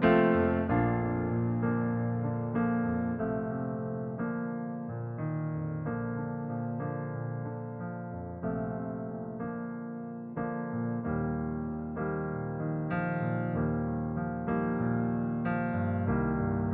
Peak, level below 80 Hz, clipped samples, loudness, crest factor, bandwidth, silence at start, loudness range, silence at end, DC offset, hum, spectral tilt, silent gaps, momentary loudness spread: -10 dBFS; -52 dBFS; under 0.1%; -32 LUFS; 20 dB; 4 kHz; 0 s; 6 LU; 0 s; under 0.1%; none; -8.5 dB/octave; none; 8 LU